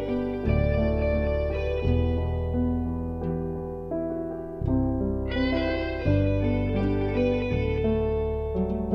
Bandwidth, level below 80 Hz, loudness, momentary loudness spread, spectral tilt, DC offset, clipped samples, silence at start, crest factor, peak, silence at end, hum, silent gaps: 5.8 kHz; -32 dBFS; -27 LUFS; 6 LU; -9.5 dB/octave; under 0.1%; under 0.1%; 0 s; 14 dB; -10 dBFS; 0 s; none; none